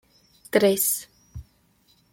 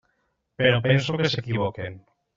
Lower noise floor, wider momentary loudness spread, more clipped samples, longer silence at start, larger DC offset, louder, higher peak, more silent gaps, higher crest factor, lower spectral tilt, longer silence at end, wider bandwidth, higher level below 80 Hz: second, -63 dBFS vs -72 dBFS; first, 25 LU vs 12 LU; neither; about the same, 0.55 s vs 0.6 s; neither; about the same, -22 LUFS vs -23 LUFS; about the same, -4 dBFS vs -4 dBFS; neither; about the same, 22 dB vs 20 dB; about the same, -3.5 dB/octave vs -4.5 dB/octave; first, 0.7 s vs 0.4 s; first, 16.5 kHz vs 7.6 kHz; about the same, -54 dBFS vs -58 dBFS